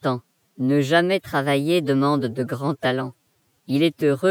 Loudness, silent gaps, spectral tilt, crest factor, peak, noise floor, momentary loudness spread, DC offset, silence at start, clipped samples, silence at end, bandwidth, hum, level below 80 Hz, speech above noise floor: -22 LUFS; none; -6.5 dB/octave; 16 dB; -6 dBFS; -66 dBFS; 8 LU; under 0.1%; 0.05 s; under 0.1%; 0 s; 17.5 kHz; none; -68 dBFS; 45 dB